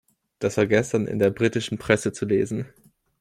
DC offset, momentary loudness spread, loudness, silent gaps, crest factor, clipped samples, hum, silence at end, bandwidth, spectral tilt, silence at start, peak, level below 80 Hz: under 0.1%; 8 LU; -23 LUFS; none; 20 dB; under 0.1%; none; 0.55 s; 15.5 kHz; -5.5 dB/octave; 0.4 s; -4 dBFS; -56 dBFS